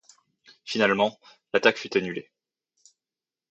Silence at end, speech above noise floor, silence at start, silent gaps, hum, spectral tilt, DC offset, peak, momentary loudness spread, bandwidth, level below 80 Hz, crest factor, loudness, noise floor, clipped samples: 1.3 s; over 66 dB; 0.65 s; none; none; -4.5 dB/octave; under 0.1%; -4 dBFS; 13 LU; 8.4 kHz; -72 dBFS; 26 dB; -25 LUFS; under -90 dBFS; under 0.1%